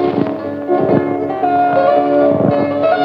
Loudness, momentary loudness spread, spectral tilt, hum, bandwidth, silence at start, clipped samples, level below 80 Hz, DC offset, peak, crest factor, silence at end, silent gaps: -14 LUFS; 6 LU; -9.5 dB/octave; none; 5.6 kHz; 0 s; under 0.1%; -54 dBFS; under 0.1%; 0 dBFS; 14 dB; 0 s; none